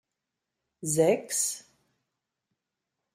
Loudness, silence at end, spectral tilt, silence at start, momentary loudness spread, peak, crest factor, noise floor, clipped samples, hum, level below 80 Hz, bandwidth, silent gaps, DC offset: -27 LUFS; 1.55 s; -3.5 dB/octave; 0.8 s; 13 LU; -10 dBFS; 22 dB; -86 dBFS; under 0.1%; none; -72 dBFS; 15.5 kHz; none; under 0.1%